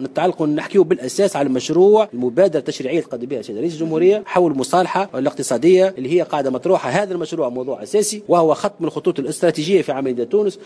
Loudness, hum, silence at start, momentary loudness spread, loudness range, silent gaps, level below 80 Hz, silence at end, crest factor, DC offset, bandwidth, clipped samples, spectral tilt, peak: -18 LUFS; none; 0 s; 8 LU; 2 LU; none; -64 dBFS; 0 s; 14 dB; under 0.1%; 11 kHz; under 0.1%; -5.5 dB/octave; -2 dBFS